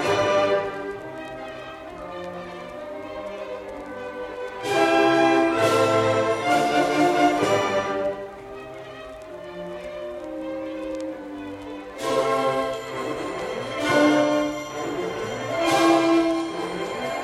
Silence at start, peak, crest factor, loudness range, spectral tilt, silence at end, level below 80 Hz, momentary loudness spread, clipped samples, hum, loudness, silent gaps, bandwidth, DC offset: 0 s; -6 dBFS; 18 dB; 14 LU; -4.5 dB/octave; 0 s; -56 dBFS; 17 LU; under 0.1%; none; -23 LUFS; none; 14.5 kHz; under 0.1%